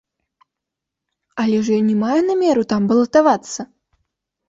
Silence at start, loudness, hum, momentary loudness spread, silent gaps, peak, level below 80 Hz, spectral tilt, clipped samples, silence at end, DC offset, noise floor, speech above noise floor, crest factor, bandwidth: 1.35 s; -17 LUFS; none; 15 LU; none; -4 dBFS; -60 dBFS; -6 dB/octave; under 0.1%; 0.85 s; under 0.1%; -83 dBFS; 67 dB; 16 dB; 7.8 kHz